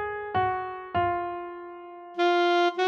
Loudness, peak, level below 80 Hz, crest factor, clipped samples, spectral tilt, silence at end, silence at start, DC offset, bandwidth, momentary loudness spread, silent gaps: -27 LUFS; -14 dBFS; -58 dBFS; 14 dB; under 0.1%; -5.5 dB/octave; 0 s; 0 s; under 0.1%; 7 kHz; 18 LU; none